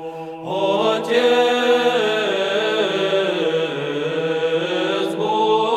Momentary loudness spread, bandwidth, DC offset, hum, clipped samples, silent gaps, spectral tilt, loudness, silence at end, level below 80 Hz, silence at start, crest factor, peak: 6 LU; 13 kHz; under 0.1%; none; under 0.1%; none; -4.5 dB/octave; -19 LUFS; 0 s; -66 dBFS; 0 s; 14 dB; -4 dBFS